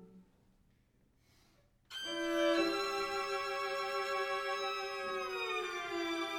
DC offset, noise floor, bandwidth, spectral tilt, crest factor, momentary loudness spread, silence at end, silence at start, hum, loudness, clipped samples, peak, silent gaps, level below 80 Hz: under 0.1%; -71 dBFS; 18.5 kHz; -2 dB/octave; 18 dB; 7 LU; 0 s; 0 s; none; -36 LUFS; under 0.1%; -22 dBFS; none; -72 dBFS